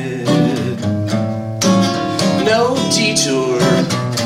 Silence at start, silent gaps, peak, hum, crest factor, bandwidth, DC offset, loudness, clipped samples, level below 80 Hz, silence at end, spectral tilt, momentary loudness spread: 0 s; none; -2 dBFS; none; 14 dB; 16 kHz; under 0.1%; -15 LUFS; under 0.1%; -50 dBFS; 0 s; -4.5 dB/octave; 6 LU